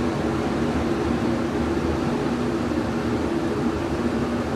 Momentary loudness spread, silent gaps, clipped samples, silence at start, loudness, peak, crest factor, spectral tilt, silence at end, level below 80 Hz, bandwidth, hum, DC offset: 1 LU; none; under 0.1%; 0 s; -24 LUFS; -10 dBFS; 12 dB; -6.5 dB/octave; 0 s; -38 dBFS; 13.5 kHz; none; under 0.1%